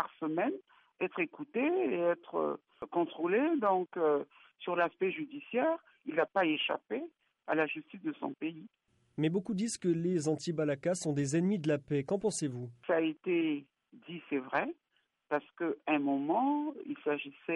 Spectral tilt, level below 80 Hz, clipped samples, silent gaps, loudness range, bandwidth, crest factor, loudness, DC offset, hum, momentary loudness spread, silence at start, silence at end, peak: -5.5 dB/octave; -78 dBFS; under 0.1%; none; 3 LU; 11 kHz; 18 dB; -34 LUFS; under 0.1%; none; 10 LU; 0 s; 0 s; -16 dBFS